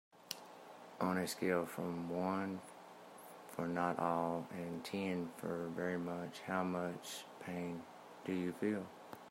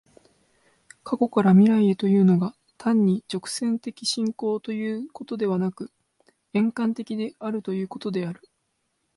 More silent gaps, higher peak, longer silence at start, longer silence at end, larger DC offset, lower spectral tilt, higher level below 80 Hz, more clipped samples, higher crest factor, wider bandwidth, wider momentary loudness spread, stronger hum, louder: neither; second, -20 dBFS vs -8 dBFS; second, 0.15 s vs 1.05 s; second, 0 s vs 0.85 s; neither; about the same, -5.5 dB/octave vs -6.5 dB/octave; second, -82 dBFS vs -70 dBFS; neither; about the same, 20 dB vs 16 dB; first, 16 kHz vs 11.5 kHz; first, 18 LU vs 13 LU; neither; second, -41 LUFS vs -24 LUFS